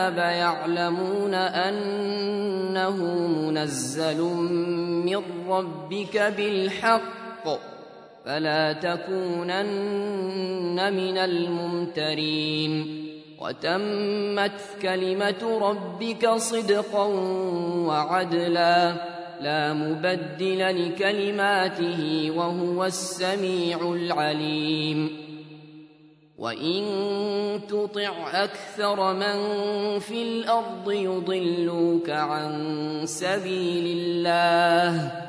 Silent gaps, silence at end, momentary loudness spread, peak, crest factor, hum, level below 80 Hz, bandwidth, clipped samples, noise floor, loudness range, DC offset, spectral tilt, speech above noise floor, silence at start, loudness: none; 0 s; 7 LU; -8 dBFS; 18 dB; none; -74 dBFS; 11 kHz; under 0.1%; -54 dBFS; 3 LU; under 0.1%; -4.5 dB/octave; 29 dB; 0 s; -25 LUFS